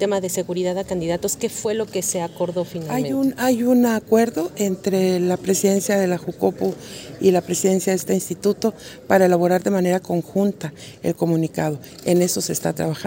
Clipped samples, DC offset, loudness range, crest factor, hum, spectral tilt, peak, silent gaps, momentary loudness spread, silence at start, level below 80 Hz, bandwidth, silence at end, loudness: under 0.1%; under 0.1%; 3 LU; 18 dB; none; -5 dB/octave; -2 dBFS; none; 8 LU; 0 s; -56 dBFS; 16.5 kHz; 0 s; -21 LUFS